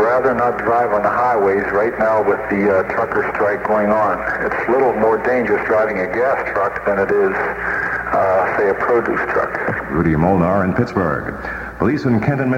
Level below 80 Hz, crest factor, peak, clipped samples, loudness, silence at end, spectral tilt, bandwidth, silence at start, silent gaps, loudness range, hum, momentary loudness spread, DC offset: -42 dBFS; 14 dB; -2 dBFS; under 0.1%; -17 LUFS; 0 s; -8.5 dB/octave; 16 kHz; 0 s; none; 1 LU; none; 4 LU; under 0.1%